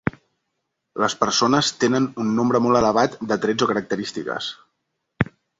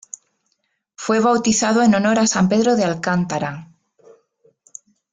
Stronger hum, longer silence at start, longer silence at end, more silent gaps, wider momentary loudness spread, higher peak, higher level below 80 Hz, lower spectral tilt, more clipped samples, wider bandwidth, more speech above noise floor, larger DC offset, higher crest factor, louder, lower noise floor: neither; second, 0.05 s vs 1 s; second, 0.35 s vs 1.5 s; neither; second, 10 LU vs 15 LU; about the same, -2 dBFS vs -4 dBFS; first, -52 dBFS vs -58 dBFS; about the same, -4.5 dB/octave vs -4.5 dB/octave; neither; second, 8 kHz vs 9.6 kHz; about the same, 57 dB vs 54 dB; neither; about the same, 20 dB vs 16 dB; second, -21 LUFS vs -17 LUFS; first, -77 dBFS vs -71 dBFS